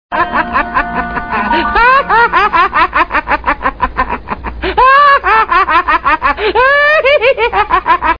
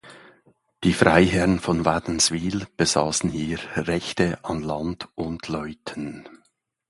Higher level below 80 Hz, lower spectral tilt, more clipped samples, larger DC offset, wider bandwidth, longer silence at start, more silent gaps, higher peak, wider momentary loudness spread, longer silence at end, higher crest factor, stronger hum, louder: first, -30 dBFS vs -44 dBFS; first, -6 dB/octave vs -4 dB/octave; neither; first, 0.4% vs under 0.1%; second, 5.2 kHz vs 11.5 kHz; about the same, 0.1 s vs 0.05 s; neither; about the same, 0 dBFS vs 0 dBFS; second, 9 LU vs 15 LU; second, 0 s vs 0.55 s; second, 10 dB vs 24 dB; neither; first, -10 LUFS vs -23 LUFS